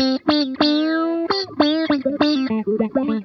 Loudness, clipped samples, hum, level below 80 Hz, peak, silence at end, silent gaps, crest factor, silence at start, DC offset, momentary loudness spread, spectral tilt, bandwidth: -19 LUFS; under 0.1%; none; -58 dBFS; -2 dBFS; 0 s; none; 16 dB; 0 s; under 0.1%; 3 LU; -5.5 dB/octave; 6.2 kHz